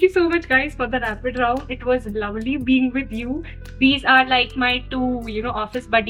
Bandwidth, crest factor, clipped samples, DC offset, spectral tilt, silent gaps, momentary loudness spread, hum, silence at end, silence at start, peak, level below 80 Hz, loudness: 11.5 kHz; 18 dB; under 0.1%; under 0.1%; -5.5 dB/octave; none; 12 LU; none; 0 s; 0 s; -2 dBFS; -38 dBFS; -20 LUFS